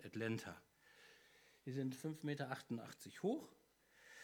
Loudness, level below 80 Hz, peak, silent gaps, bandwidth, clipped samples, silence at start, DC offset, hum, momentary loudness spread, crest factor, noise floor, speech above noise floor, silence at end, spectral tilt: -47 LUFS; -86 dBFS; -30 dBFS; none; over 20 kHz; under 0.1%; 0 s; under 0.1%; none; 21 LU; 18 dB; -71 dBFS; 25 dB; 0 s; -6 dB/octave